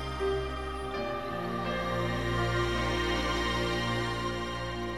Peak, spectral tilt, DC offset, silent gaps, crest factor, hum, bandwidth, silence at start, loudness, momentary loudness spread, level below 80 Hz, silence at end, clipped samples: -18 dBFS; -5 dB/octave; 0.3%; none; 12 dB; none; 15.5 kHz; 0 s; -31 LUFS; 5 LU; -42 dBFS; 0 s; under 0.1%